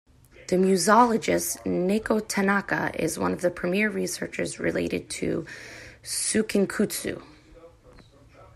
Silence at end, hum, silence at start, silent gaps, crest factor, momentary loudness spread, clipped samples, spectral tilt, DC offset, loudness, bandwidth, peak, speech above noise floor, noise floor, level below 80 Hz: 0.1 s; none; 0.4 s; none; 20 dB; 12 LU; under 0.1%; -4.5 dB/octave; under 0.1%; -25 LUFS; 15.5 kHz; -6 dBFS; 27 dB; -52 dBFS; -56 dBFS